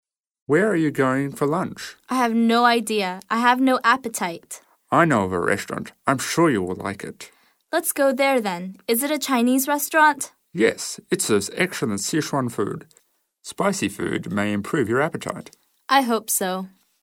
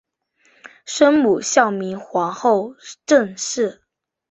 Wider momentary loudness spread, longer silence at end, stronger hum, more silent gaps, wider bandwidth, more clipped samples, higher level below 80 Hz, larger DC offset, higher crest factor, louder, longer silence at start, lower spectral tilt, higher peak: about the same, 13 LU vs 13 LU; second, 0.35 s vs 0.6 s; neither; neither; first, 18.5 kHz vs 8.4 kHz; neither; about the same, -64 dBFS vs -64 dBFS; neither; about the same, 20 dB vs 18 dB; second, -21 LUFS vs -18 LUFS; second, 0.5 s vs 0.65 s; about the same, -4 dB/octave vs -3.5 dB/octave; about the same, -4 dBFS vs -2 dBFS